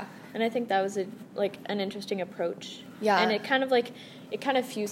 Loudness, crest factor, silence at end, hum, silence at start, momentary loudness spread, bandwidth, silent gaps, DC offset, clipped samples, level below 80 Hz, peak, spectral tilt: -29 LUFS; 20 dB; 0 s; none; 0 s; 14 LU; 16 kHz; none; under 0.1%; under 0.1%; -80 dBFS; -10 dBFS; -4.5 dB/octave